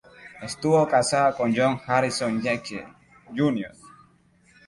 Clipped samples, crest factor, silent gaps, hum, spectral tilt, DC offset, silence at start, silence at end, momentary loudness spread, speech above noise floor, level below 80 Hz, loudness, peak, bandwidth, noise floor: under 0.1%; 18 dB; none; none; -5 dB/octave; under 0.1%; 0.2 s; 0.8 s; 16 LU; 36 dB; -60 dBFS; -23 LUFS; -6 dBFS; 11.5 kHz; -59 dBFS